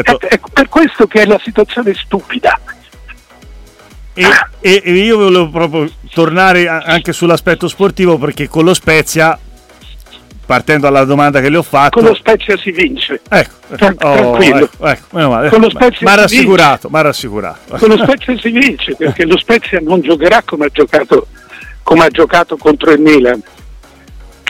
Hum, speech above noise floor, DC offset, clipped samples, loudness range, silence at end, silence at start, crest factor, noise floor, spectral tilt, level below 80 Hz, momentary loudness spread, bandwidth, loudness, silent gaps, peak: none; 26 dB; under 0.1%; 0.1%; 3 LU; 0 s; 0 s; 10 dB; -35 dBFS; -5 dB/octave; -36 dBFS; 8 LU; 17 kHz; -9 LUFS; none; 0 dBFS